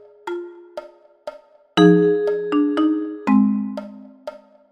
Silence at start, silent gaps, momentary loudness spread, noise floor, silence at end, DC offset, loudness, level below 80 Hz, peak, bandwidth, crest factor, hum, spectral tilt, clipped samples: 0.25 s; none; 24 LU; -38 dBFS; 0.35 s; under 0.1%; -18 LUFS; -64 dBFS; -2 dBFS; 9 kHz; 20 dB; none; -7.5 dB/octave; under 0.1%